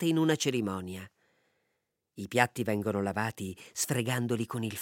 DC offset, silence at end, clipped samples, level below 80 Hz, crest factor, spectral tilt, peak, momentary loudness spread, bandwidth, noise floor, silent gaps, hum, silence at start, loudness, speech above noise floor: under 0.1%; 0 s; under 0.1%; -76 dBFS; 26 dB; -4.5 dB/octave; -6 dBFS; 12 LU; 17 kHz; -81 dBFS; none; none; 0 s; -31 LUFS; 50 dB